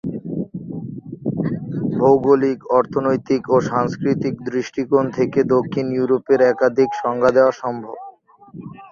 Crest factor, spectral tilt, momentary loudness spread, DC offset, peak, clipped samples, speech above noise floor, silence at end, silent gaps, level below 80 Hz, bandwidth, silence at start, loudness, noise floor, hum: 16 dB; -7.5 dB/octave; 15 LU; under 0.1%; -2 dBFS; under 0.1%; 25 dB; 0 s; none; -56 dBFS; 7.2 kHz; 0.05 s; -19 LUFS; -42 dBFS; none